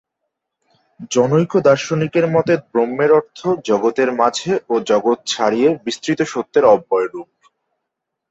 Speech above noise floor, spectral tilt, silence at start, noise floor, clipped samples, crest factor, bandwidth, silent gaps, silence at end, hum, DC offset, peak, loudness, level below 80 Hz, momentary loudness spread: 63 dB; -5.5 dB/octave; 1 s; -79 dBFS; under 0.1%; 16 dB; 8.2 kHz; none; 1.05 s; none; under 0.1%; -2 dBFS; -17 LUFS; -60 dBFS; 7 LU